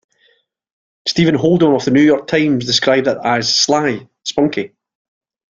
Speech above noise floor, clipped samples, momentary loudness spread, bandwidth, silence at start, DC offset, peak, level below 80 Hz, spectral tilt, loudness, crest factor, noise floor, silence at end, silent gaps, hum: 44 dB; under 0.1%; 10 LU; 7.6 kHz; 1.05 s; under 0.1%; 0 dBFS; -54 dBFS; -4.5 dB/octave; -14 LUFS; 16 dB; -58 dBFS; 0.85 s; none; none